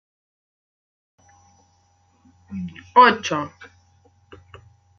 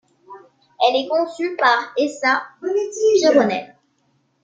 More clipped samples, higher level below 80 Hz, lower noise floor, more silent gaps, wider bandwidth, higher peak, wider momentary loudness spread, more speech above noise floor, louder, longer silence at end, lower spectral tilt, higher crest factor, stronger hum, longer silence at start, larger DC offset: neither; about the same, -68 dBFS vs -70 dBFS; about the same, -61 dBFS vs -64 dBFS; neither; second, 7 kHz vs 9 kHz; about the same, -2 dBFS vs -2 dBFS; first, 21 LU vs 8 LU; about the same, 43 dB vs 46 dB; about the same, -17 LUFS vs -18 LUFS; first, 1.5 s vs 0.8 s; about the same, -4 dB/octave vs -3 dB/octave; first, 24 dB vs 18 dB; neither; first, 2.5 s vs 0.3 s; neither